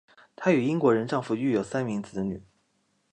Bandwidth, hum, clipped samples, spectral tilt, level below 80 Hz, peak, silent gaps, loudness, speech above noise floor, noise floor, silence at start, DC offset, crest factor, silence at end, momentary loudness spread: 10 kHz; none; under 0.1%; -7 dB/octave; -62 dBFS; -8 dBFS; none; -27 LUFS; 46 dB; -72 dBFS; 0.4 s; under 0.1%; 20 dB; 0.7 s; 10 LU